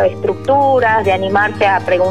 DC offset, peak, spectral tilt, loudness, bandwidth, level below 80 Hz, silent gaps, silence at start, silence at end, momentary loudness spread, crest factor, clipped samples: 1%; -2 dBFS; -6.5 dB/octave; -13 LUFS; 11 kHz; -46 dBFS; none; 0 s; 0 s; 4 LU; 10 dB; under 0.1%